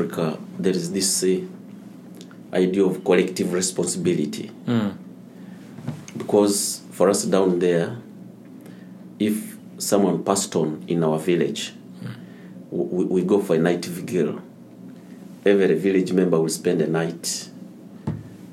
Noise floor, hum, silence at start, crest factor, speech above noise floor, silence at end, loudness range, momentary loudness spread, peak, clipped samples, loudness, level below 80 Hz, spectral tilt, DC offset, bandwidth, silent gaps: -42 dBFS; none; 0 s; 20 dB; 21 dB; 0 s; 2 LU; 22 LU; -4 dBFS; under 0.1%; -22 LUFS; -66 dBFS; -5 dB/octave; under 0.1%; 16 kHz; none